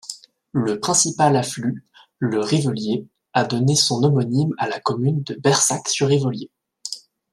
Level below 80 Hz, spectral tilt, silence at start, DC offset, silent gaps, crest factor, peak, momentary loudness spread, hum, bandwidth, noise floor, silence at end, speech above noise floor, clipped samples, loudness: -62 dBFS; -4.5 dB/octave; 0.05 s; under 0.1%; none; 18 dB; -2 dBFS; 15 LU; none; 13.5 kHz; -39 dBFS; 0.35 s; 20 dB; under 0.1%; -20 LUFS